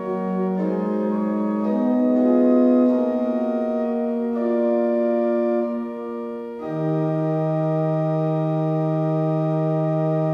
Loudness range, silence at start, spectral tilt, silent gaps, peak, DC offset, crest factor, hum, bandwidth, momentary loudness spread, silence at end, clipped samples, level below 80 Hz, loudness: 3 LU; 0 s; -11 dB/octave; none; -8 dBFS; under 0.1%; 14 dB; none; 5.4 kHz; 8 LU; 0 s; under 0.1%; -64 dBFS; -21 LUFS